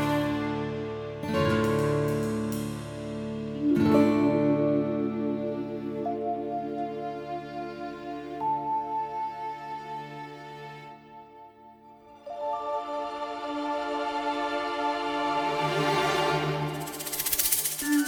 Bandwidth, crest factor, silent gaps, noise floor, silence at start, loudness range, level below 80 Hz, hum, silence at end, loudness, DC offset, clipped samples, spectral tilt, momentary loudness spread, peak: over 20 kHz; 20 dB; none; -52 dBFS; 0 s; 11 LU; -58 dBFS; none; 0 s; -29 LUFS; under 0.1%; under 0.1%; -4.5 dB/octave; 14 LU; -10 dBFS